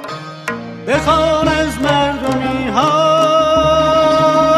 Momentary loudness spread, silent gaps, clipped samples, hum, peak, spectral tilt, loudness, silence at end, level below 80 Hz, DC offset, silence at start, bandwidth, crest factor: 13 LU; none; under 0.1%; none; 0 dBFS; -5 dB/octave; -13 LUFS; 0 s; -34 dBFS; under 0.1%; 0 s; 13.5 kHz; 12 dB